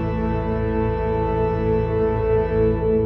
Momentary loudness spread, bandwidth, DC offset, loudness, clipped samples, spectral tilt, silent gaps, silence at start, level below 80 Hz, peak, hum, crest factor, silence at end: 4 LU; 5.6 kHz; under 0.1%; -21 LUFS; under 0.1%; -10.5 dB/octave; none; 0 s; -30 dBFS; -8 dBFS; none; 12 dB; 0 s